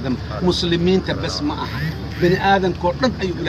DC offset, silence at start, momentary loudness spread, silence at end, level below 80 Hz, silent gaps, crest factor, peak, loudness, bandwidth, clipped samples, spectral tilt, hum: under 0.1%; 0 s; 8 LU; 0 s; -34 dBFS; none; 16 dB; -4 dBFS; -19 LUFS; 14.5 kHz; under 0.1%; -6 dB/octave; none